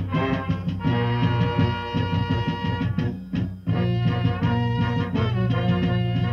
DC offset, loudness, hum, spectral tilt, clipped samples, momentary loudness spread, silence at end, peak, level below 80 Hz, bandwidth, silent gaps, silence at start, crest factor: under 0.1%; -24 LUFS; none; -8.5 dB/octave; under 0.1%; 4 LU; 0 s; -8 dBFS; -42 dBFS; 6 kHz; none; 0 s; 14 dB